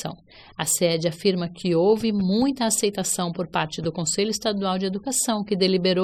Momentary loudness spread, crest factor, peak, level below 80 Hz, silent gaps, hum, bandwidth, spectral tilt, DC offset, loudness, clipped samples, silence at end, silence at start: 6 LU; 16 dB; -6 dBFS; -56 dBFS; none; none; 17 kHz; -4 dB/octave; under 0.1%; -23 LUFS; under 0.1%; 0 s; 0 s